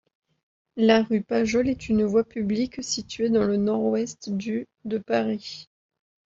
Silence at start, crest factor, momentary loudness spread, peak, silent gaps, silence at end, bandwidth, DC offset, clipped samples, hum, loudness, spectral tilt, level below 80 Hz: 0.75 s; 20 dB; 11 LU; -6 dBFS; none; 0.65 s; 7.8 kHz; under 0.1%; under 0.1%; none; -25 LUFS; -5 dB/octave; -56 dBFS